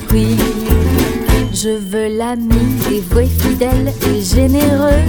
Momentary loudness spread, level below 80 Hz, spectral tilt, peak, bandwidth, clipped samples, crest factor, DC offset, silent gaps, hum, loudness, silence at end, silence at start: 5 LU; -18 dBFS; -6 dB/octave; 0 dBFS; over 20 kHz; under 0.1%; 12 dB; under 0.1%; none; none; -14 LUFS; 0 s; 0 s